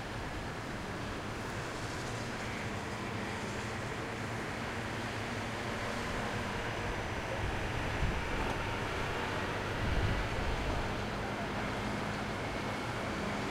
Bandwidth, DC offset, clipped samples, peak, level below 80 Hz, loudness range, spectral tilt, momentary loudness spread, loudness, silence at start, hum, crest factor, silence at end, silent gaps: 16 kHz; under 0.1%; under 0.1%; -20 dBFS; -44 dBFS; 3 LU; -5 dB/octave; 4 LU; -37 LUFS; 0 s; none; 16 dB; 0 s; none